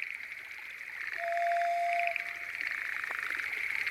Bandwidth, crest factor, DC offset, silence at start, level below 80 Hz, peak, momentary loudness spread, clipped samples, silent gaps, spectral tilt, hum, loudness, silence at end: 16.5 kHz; 18 dB; under 0.1%; 0 s; -74 dBFS; -16 dBFS; 11 LU; under 0.1%; none; -1 dB/octave; none; -33 LUFS; 0 s